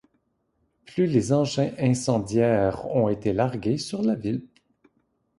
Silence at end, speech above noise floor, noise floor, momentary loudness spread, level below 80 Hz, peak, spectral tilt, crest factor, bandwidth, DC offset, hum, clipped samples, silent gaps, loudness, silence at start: 0.95 s; 48 dB; -72 dBFS; 6 LU; -54 dBFS; -8 dBFS; -6.5 dB/octave; 18 dB; 11.5 kHz; under 0.1%; none; under 0.1%; none; -24 LUFS; 0.9 s